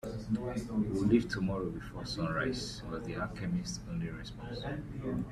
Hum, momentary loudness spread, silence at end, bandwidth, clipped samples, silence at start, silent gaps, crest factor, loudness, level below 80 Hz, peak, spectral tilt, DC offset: none; 11 LU; 0 s; 13.5 kHz; under 0.1%; 0.05 s; none; 20 dB; -36 LUFS; -50 dBFS; -14 dBFS; -6 dB/octave; under 0.1%